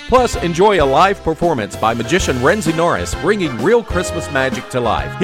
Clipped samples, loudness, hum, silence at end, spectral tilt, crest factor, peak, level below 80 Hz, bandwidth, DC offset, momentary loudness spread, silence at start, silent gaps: under 0.1%; -15 LUFS; none; 0 s; -5 dB/octave; 14 dB; -2 dBFS; -32 dBFS; 16.5 kHz; under 0.1%; 6 LU; 0 s; none